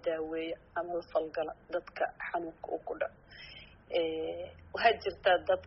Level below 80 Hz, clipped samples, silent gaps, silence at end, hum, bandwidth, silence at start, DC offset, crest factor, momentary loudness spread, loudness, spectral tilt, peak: -62 dBFS; under 0.1%; none; 0 s; none; 5.8 kHz; 0.05 s; under 0.1%; 22 dB; 15 LU; -34 LUFS; -1.5 dB/octave; -12 dBFS